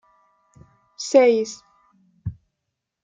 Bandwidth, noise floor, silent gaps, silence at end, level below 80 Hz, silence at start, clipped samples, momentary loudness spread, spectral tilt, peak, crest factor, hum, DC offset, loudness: 9.2 kHz; -81 dBFS; none; 0.7 s; -56 dBFS; 1 s; under 0.1%; 20 LU; -4.5 dB/octave; -4 dBFS; 20 dB; none; under 0.1%; -19 LUFS